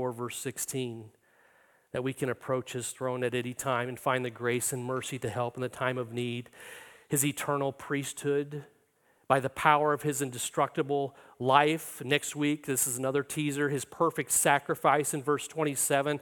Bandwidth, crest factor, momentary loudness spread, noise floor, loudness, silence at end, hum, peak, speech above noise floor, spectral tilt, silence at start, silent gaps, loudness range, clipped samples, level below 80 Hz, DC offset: 17.5 kHz; 24 dB; 10 LU; -68 dBFS; -30 LUFS; 0 s; none; -6 dBFS; 38 dB; -4 dB/octave; 0 s; none; 5 LU; under 0.1%; -70 dBFS; under 0.1%